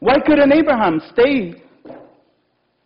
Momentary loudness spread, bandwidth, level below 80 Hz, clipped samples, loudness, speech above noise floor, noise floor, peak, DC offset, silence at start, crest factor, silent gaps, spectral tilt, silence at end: 8 LU; 5.6 kHz; -46 dBFS; under 0.1%; -14 LUFS; 51 dB; -65 dBFS; -4 dBFS; under 0.1%; 0 s; 12 dB; none; -9 dB/octave; 0.9 s